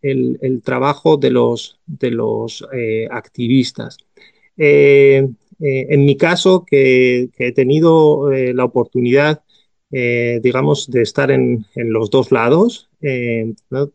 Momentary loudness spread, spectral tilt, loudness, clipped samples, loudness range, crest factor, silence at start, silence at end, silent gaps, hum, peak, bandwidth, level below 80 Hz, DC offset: 12 LU; -6.5 dB/octave; -14 LUFS; under 0.1%; 5 LU; 14 dB; 0.05 s; 0.05 s; none; none; 0 dBFS; 9 kHz; -60 dBFS; under 0.1%